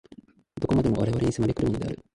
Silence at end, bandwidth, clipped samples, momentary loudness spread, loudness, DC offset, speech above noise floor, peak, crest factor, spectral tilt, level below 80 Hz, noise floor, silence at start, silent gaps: 0.2 s; 11.5 kHz; under 0.1%; 9 LU; -26 LUFS; under 0.1%; 27 dB; -10 dBFS; 16 dB; -8 dB/octave; -44 dBFS; -52 dBFS; 0.55 s; none